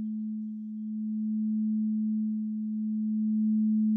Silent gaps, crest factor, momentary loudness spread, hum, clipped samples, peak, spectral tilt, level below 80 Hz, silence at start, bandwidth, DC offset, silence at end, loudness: none; 8 dB; 9 LU; none; under 0.1%; -22 dBFS; -16.5 dB/octave; under -90 dBFS; 0 s; 0.5 kHz; under 0.1%; 0 s; -30 LUFS